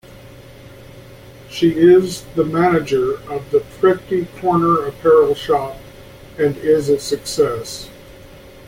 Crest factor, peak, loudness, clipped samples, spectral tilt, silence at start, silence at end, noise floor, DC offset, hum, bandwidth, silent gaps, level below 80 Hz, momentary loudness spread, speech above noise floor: 16 dB; -2 dBFS; -16 LUFS; under 0.1%; -6 dB/octave; 0.1 s; 0.4 s; -40 dBFS; under 0.1%; none; 16.5 kHz; none; -46 dBFS; 16 LU; 24 dB